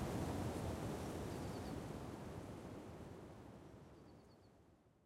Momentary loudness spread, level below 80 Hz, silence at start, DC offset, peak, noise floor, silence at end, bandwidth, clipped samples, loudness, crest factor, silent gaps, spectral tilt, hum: 19 LU; -62 dBFS; 0 s; under 0.1%; -32 dBFS; -70 dBFS; 0.15 s; 16 kHz; under 0.1%; -48 LUFS; 18 dB; none; -6.5 dB/octave; none